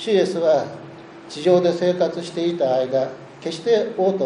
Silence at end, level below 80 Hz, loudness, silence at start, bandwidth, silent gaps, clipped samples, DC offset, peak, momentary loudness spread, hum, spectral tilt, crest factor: 0 s; -68 dBFS; -20 LUFS; 0 s; 10.5 kHz; none; under 0.1%; under 0.1%; -4 dBFS; 16 LU; none; -6 dB/octave; 16 dB